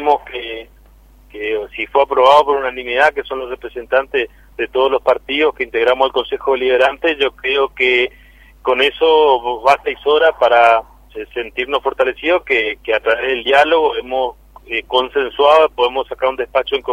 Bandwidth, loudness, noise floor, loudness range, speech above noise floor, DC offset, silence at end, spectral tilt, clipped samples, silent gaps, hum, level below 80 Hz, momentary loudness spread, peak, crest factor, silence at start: 14.5 kHz; -15 LUFS; -45 dBFS; 2 LU; 30 dB; under 0.1%; 0 s; -3.5 dB/octave; under 0.1%; none; none; -46 dBFS; 13 LU; 0 dBFS; 16 dB; 0 s